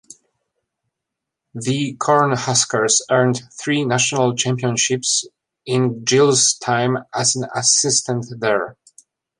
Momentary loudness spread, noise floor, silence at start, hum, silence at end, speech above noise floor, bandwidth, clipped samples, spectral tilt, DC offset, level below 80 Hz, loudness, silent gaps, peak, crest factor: 9 LU; -82 dBFS; 1.55 s; none; 0.65 s; 64 dB; 11.5 kHz; under 0.1%; -3 dB/octave; under 0.1%; -62 dBFS; -17 LUFS; none; -2 dBFS; 18 dB